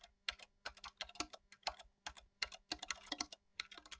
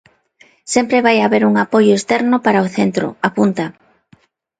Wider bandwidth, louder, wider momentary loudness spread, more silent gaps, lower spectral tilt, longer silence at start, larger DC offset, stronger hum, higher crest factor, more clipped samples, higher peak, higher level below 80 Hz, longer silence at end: second, 8 kHz vs 9.4 kHz; second, -47 LUFS vs -14 LUFS; about the same, 8 LU vs 6 LU; neither; second, -0.5 dB/octave vs -5 dB/octave; second, 0 s vs 0.65 s; neither; neither; first, 28 dB vs 16 dB; neither; second, -22 dBFS vs 0 dBFS; second, -70 dBFS vs -58 dBFS; second, 0 s vs 0.9 s